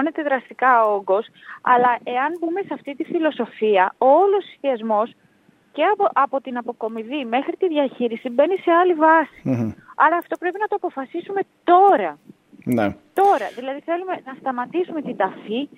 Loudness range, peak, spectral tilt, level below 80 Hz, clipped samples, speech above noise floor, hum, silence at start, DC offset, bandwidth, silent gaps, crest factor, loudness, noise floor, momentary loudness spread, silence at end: 4 LU; -2 dBFS; -7 dB/octave; -68 dBFS; under 0.1%; 37 dB; none; 0 s; under 0.1%; 16 kHz; none; 18 dB; -20 LUFS; -57 dBFS; 12 LU; 0.1 s